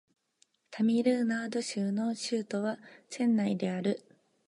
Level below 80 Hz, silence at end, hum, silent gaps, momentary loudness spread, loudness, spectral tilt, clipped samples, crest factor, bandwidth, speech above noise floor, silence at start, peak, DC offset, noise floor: -82 dBFS; 0.5 s; none; none; 11 LU; -31 LUFS; -5.5 dB/octave; under 0.1%; 18 dB; 11.5 kHz; 41 dB; 0.7 s; -14 dBFS; under 0.1%; -71 dBFS